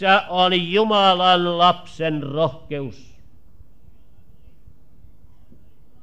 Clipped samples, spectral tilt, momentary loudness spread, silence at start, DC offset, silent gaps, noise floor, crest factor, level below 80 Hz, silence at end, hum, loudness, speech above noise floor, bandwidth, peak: under 0.1%; -5.5 dB/octave; 15 LU; 0 s; 1%; none; -52 dBFS; 18 dB; -54 dBFS; 3.1 s; none; -18 LUFS; 33 dB; 9 kHz; -4 dBFS